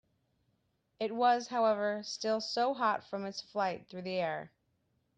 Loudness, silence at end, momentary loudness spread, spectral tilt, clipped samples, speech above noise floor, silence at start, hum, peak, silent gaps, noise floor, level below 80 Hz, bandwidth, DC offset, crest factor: -33 LUFS; 0.7 s; 10 LU; -4 dB/octave; under 0.1%; 45 dB; 1 s; none; -16 dBFS; none; -77 dBFS; -80 dBFS; 9.2 kHz; under 0.1%; 18 dB